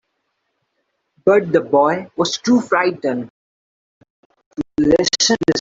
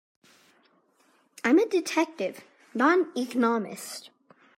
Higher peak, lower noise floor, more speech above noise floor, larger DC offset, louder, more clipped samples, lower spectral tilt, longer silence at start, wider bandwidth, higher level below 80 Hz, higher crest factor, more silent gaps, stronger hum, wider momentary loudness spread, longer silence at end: first, -2 dBFS vs -8 dBFS; first, -72 dBFS vs -65 dBFS; first, 56 dB vs 40 dB; neither; first, -17 LUFS vs -26 LUFS; neither; about the same, -3.5 dB/octave vs -4 dB/octave; second, 1.25 s vs 1.45 s; second, 8 kHz vs 16 kHz; first, -52 dBFS vs -80 dBFS; about the same, 16 dB vs 20 dB; first, 3.30-4.01 s, 4.10-4.30 s, 4.46-4.51 s vs none; neither; second, 12 LU vs 15 LU; second, 0 s vs 0.5 s